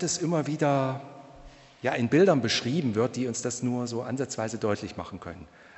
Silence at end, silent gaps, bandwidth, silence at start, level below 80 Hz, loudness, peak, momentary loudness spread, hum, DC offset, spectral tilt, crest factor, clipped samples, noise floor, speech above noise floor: 0.3 s; none; 8.4 kHz; 0 s; -60 dBFS; -27 LUFS; -8 dBFS; 17 LU; none; under 0.1%; -5 dB/octave; 18 dB; under 0.1%; -50 dBFS; 23 dB